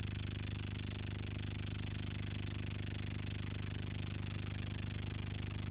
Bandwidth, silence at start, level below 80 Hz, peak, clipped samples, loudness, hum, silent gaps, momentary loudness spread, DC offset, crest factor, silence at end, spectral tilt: 4 kHz; 0 s; -50 dBFS; -30 dBFS; under 0.1%; -43 LUFS; 50 Hz at -45 dBFS; none; 0 LU; under 0.1%; 12 dB; 0 s; -5.5 dB/octave